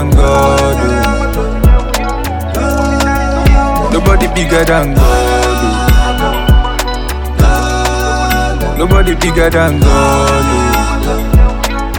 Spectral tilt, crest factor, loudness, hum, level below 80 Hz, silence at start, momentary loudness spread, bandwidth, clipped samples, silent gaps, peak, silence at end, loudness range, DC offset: -5.5 dB/octave; 10 dB; -11 LUFS; none; -12 dBFS; 0 s; 6 LU; 19.5 kHz; under 0.1%; none; 0 dBFS; 0 s; 2 LU; under 0.1%